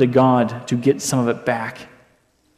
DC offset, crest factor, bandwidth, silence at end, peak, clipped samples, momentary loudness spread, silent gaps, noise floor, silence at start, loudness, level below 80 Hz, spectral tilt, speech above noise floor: under 0.1%; 16 dB; 14.5 kHz; 0.7 s; -2 dBFS; under 0.1%; 12 LU; none; -60 dBFS; 0 s; -19 LUFS; -60 dBFS; -6 dB/octave; 42 dB